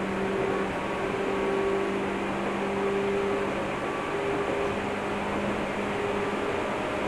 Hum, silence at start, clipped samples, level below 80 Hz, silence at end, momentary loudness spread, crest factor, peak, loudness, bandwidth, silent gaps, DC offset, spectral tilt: none; 0 s; under 0.1%; -50 dBFS; 0 s; 3 LU; 12 dB; -16 dBFS; -29 LUFS; 12.5 kHz; none; under 0.1%; -5.5 dB/octave